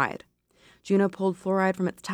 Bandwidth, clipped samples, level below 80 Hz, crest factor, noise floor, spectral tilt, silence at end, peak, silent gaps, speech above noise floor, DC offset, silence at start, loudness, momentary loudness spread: 12.5 kHz; under 0.1%; -68 dBFS; 18 dB; -60 dBFS; -7 dB/octave; 0 s; -8 dBFS; none; 34 dB; under 0.1%; 0 s; -26 LUFS; 6 LU